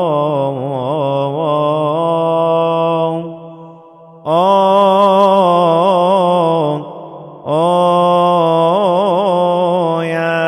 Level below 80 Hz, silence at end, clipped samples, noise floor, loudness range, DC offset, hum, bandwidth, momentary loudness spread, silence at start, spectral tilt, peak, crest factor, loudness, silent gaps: -64 dBFS; 0 s; under 0.1%; -39 dBFS; 4 LU; under 0.1%; none; 11.5 kHz; 9 LU; 0 s; -7 dB/octave; 0 dBFS; 12 dB; -13 LUFS; none